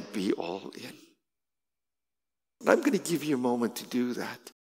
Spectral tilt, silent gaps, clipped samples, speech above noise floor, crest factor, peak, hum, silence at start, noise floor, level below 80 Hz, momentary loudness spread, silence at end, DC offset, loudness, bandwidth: -5 dB/octave; none; under 0.1%; over 60 dB; 26 dB; -4 dBFS; none; 0 s; under -90 dBFS; -86 dBFS; 15 LU; 0.2 s; under 0.1%; -30 LUFS; 16 kHz